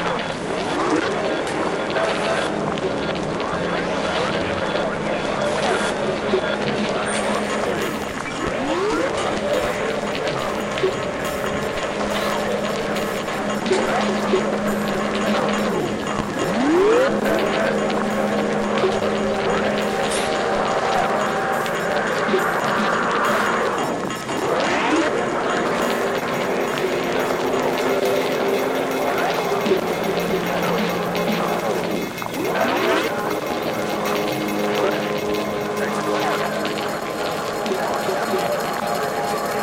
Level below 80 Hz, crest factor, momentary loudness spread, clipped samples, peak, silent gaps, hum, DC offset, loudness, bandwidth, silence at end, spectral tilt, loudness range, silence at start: -48 dBFS; 16 dB; 4 LU; under 0.1%; -4 dBFS; none; none; under 0.1%; -21 LUFS; 16.5 kHz; 0 s; -4.5 dB/octave; 3 LU; 0 s